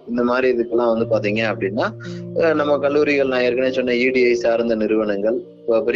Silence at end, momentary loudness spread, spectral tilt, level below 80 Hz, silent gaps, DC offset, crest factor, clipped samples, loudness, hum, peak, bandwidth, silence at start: 0 s; 6 LU; -6.5 dB/octave; -54 dBFS; none; under 0.1%; 14 dB; under 0.1%; -19 LUFS; none; -4 dBFS; 7.4 kHz; 0.05 s